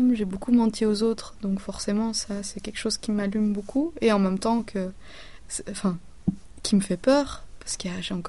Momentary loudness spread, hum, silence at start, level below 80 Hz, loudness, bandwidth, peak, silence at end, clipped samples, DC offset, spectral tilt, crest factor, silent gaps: 11 LU; none; 0 s; -48 dBFS; -26 LUFS; 11.5 kHz; -8 dBFS; 0 s; under 0.1%; 0.6%; -5 dB/octave; 18 dB; none